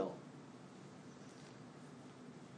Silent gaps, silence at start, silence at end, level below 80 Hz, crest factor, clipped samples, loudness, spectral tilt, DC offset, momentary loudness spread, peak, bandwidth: none; 0 s; 0 s; -88 dBFS; 24 dB; under 0.1%; -54 LUFS; -6 dB/octave; under 0.1%; 2 LU; -28 dBFS; 10 kHz